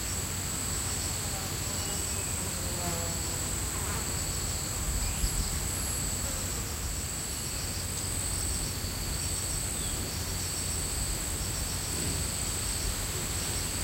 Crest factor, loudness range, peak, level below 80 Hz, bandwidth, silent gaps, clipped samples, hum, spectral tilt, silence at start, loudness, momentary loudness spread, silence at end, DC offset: 16 dB; 1 LU; -16 dBFS; -40 dBFS; 16 kHz; none; under 0.1%; none; -2.5 dB/octave; 0 s; -31 LUFS; 2 LU; 0 s; under 0.1%